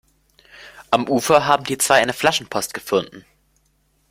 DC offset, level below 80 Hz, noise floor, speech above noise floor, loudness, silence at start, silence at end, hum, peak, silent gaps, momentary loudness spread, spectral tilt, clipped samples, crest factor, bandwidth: under 0.1%; -58 dBFS; -63 dBFS; 45 dB; -18 LUFS; 0.6 s; 0.9 s; none; 0 dBFS; none; 9 LU; -3 dB/octave; under 0.1%; 20 dB; 16.5 kHz